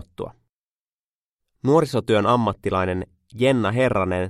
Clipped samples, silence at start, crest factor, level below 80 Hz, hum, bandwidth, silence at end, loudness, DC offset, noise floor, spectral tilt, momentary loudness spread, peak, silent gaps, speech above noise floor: under 0.1%; 0.2 s; 16 dB; -50 dBFS; none; 13.5 kHz; 0 s; -21 LUFS; under 0.1%; under -90 dBFS; -7 dB/octave; 16 LU; -6 dBFS; 0.49-1.37 s; over 70 dB